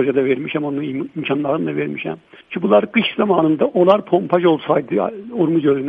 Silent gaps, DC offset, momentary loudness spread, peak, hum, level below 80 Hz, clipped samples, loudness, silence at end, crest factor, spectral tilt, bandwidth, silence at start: none; under 0.1%; 10 LU; 0 dBFS; none; -62 dBFS; under 0.1%; -18 LUFS; 0 s; 16 dB; -9 dB/octave; 5 kHz; 0 s